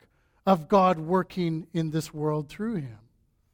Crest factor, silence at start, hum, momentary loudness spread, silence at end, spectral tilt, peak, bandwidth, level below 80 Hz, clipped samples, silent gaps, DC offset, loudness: 20 dB; 0.45 s; none; 10 LU; 0.6 s; -7 dB/octave; -8 dBFS; 17 kHz; -60 dBFS; under 0.1%; none; under 0.1%; -27 LUFS